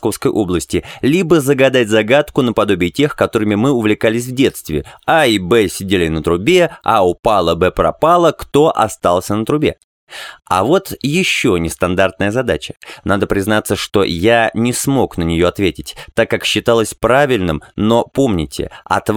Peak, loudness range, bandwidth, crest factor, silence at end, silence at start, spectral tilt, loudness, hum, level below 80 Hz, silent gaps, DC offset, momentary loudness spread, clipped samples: 0 dBFS; 3 LU; 18.5 kHz; 14 dB; 0 s; 0 s; -5 dB/octave; -14 LUFS; none; -38 dBFS; 9.84-10.07 s; under 0.1%; 7 LU; under 0.1%